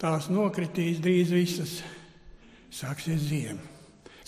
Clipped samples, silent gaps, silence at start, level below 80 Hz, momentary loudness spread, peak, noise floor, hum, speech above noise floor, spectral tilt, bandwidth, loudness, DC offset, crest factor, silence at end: under 0.1%; none; 0 s; -60 dBFS; 18 LU; -14 dBFS; -52 dBFS; none; 24 dB; -6 dB/octave; 15.5 kHz; -28 LUFS; under 0.1%; 16 dB; 0.05 s